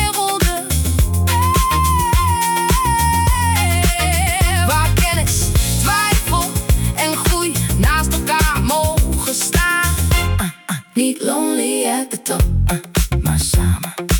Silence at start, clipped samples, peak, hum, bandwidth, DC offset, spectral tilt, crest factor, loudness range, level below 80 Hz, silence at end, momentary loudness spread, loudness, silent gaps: 0 s; under 0.1%; -2 dBFS; none; 18 kHz; under 0.1%; -4 dB/octave; 12 dB; 3 LU; -22 dBFS; 0 s; 4 LU; -16 LUFS; none